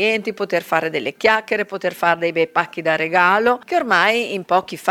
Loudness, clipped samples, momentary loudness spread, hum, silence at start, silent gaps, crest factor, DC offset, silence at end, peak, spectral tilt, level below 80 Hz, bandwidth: -18 LUFS; under 0.1%; 7 LU; none; 0 s; none; 18 dB; under 0.1%; 0 s; 0 dBFS; -4 dB/octave; -62 dBFS; 18.5 kHz